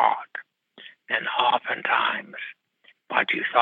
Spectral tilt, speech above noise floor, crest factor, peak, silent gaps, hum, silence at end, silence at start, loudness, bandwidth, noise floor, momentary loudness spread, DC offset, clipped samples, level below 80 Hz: -5 dB/octave; 36 dB; 22 dB; -4 dBFS; none; none; 0 s; 0 s; -24 LUFS; 4.6 kHz; -60 dBFS; 16 LU; under 0.1%; under 0.1%; -86 dBFS